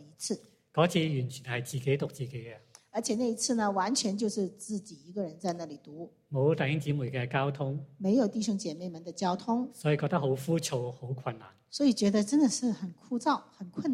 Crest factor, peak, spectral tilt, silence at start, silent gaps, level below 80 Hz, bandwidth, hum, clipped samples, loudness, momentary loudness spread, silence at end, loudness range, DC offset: 20 dB; -12 dBFS; -5.5 dB/octave; 0 s; none; -72 dBFS; 15.5 kHz; none; under 0.1%; -31 LUFS; 13 LU; 0 s; 3 LU; under 0.1%